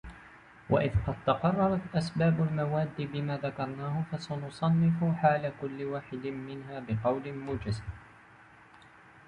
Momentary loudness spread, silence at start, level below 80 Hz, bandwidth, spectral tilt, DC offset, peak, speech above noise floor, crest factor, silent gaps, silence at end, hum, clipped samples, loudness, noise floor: 11 LU; 0.05 s; -50 dBFS; 9.8 kHz; -8 dB/octave; under 0.1%; -12 dBFS; 26 dB; 20 dB; none; 0.1 s; none; under 0.1%; -31 LUFS; -56 dBFS